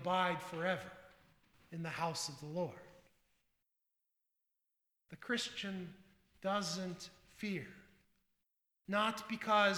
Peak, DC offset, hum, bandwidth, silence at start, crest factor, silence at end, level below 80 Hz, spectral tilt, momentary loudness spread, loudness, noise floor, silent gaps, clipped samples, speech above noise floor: -18 dBFS; under 0.1%; none; over 20 kHz; 0 s; 24 dB; 0 s; -78 dBFS; -4 dB/octave; 18 LU; -39 LUFS; -87 dBFS; none; under 0.1%; 49 dB